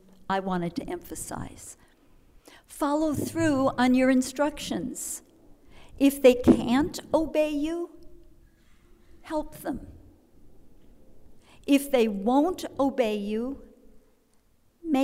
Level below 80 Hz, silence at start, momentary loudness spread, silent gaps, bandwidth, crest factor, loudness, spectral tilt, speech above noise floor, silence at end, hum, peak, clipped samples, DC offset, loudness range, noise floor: -50 dBFS; 0.3 s; 17 LU; none; 16 kHz; 22 dB; -26 LUFS; -5 dB/octave; 38 dB; 0 s; none; -6 dBFS; under 0.1%; under 0.1%; 12 LU; -63 dBFS